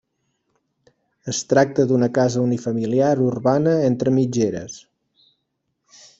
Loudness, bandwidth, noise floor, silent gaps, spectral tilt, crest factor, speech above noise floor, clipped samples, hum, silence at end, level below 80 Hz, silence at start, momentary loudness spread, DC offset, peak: -19 LUFS; 8 kHz; -74 dBFS; none; -6.5 dB/octave; 20 dB; 56 dB; under 0.1%; none; 1.4 s; -60 dBFS; 1.25 s; 10 LU; under 0.1%; -2 dBFS